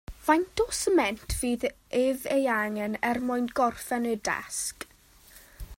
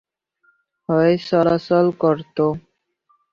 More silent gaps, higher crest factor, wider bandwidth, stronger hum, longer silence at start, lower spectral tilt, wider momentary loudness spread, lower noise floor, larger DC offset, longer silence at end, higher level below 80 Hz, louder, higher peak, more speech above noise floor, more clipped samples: neither; about the same, 20 dB vs 16 dB; first, 16 kHz vs 7 kHz; neither; second, 0.1 s vs 0.9 s; second, -3.5 dB/octave vs -8.5 dB/octave; about the same, 7 LU vs 5 LU; second, -55 dBFS vs -64 dBFS; neither; second, 0.05 s vs 0.75 s; first, -48 dBFS vs -58 dBFS; second, -28 LUFS vs -18 LUFS; second, -8 dBFS vs -4 dBFS; second, 28 dB vs 47 dB; neither